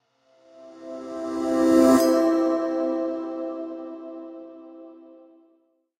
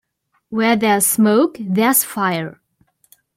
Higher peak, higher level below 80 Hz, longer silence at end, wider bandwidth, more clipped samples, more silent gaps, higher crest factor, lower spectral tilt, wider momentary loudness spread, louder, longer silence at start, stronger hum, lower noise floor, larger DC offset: second, -6 dBFS vs -2 dBFS; about the same, -62 dBFS vs -62 dBFS; first, 1.05 s vs 0.85 s; about the same, 16 kHz vs 16.5 kHz; neither; neither; about the same, 20 dB vs 16 dB; about the same, -5 dB/octave vs -4 dB/octave; first, 25 LU vs 10 LU; second, -22 LUFS vs -16 LUFS; about the same, 0.6 s vs 0.5 s; neither; first, -66 dBFS vs -55 dBFS; neither